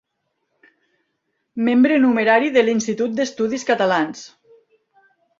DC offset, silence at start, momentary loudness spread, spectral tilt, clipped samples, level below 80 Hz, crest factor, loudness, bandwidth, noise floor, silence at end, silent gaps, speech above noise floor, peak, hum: under 0.1%; 1.55 s; 9 LU; -4.5 dB/octave; under 0.1%; -66 dBFS; 18 dB; -18 LUFS; 7.6 kHz; -74 dBFS; 1.1 s; none; 56 dB; -2 dBFS; none